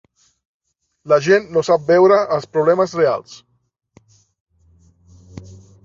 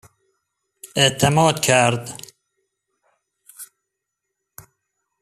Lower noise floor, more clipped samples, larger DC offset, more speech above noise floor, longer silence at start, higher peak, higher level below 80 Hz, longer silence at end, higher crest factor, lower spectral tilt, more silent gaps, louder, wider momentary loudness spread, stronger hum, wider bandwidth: second, -54 dBFS vs -80 dBFS; neither; neither; second, 39 dB vs 63 dB; first, 1.05 s vs 0.85 s; about the same, -2 dBFS vs -2 dBFS; about the same, -56 dBFS vs -56 dBFS; second, 0.3 s vs 1.55 s; about the same, 18 dB vs 22 dB; first, -6 dB/octave vs -3.5 dB/octave; first, 4.40-4.46 s vs none; about the same, -15 LUFS vs -17 LUFS; second, 11 LU vs 24 LU; neither; second, 7.6 kHz vs 15 kHz